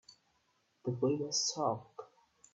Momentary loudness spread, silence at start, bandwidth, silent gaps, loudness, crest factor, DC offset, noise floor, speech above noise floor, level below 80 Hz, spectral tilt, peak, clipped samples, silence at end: 17 LU; 0.1 s; 8.4 kHz; none; -35 LUFS; 18 dB; under 0.1%; -76 dBFS; 42 dB; -78 dBFS; -4 dB/octave; -20 dBFS; under 0.1%; 0.5 s